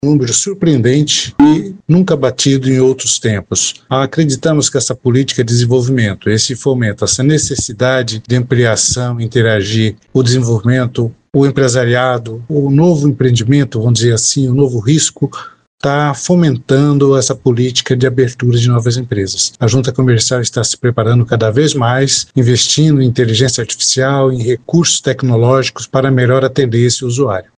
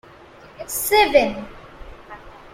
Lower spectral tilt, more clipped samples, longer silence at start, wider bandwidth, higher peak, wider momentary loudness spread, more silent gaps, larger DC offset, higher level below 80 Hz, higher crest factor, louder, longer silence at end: first, -5 dB/octave vs -2 dB/octave; neither; second, 0.05 s vs 0.6 s; second, 10 kHz vs 16.5 kHz; about the same, 0 dBFS vs -2 dBFS; second, 5 LU vs 26 LU; first, 15.67-15.78 s vs none; neither; about the same, -44 dBFS vs -46 dBFS; second, 12 dB vs 20 dB; first, -12 LUFS vs -18 LUFS; about the same, 0.15 s vs 0.25 s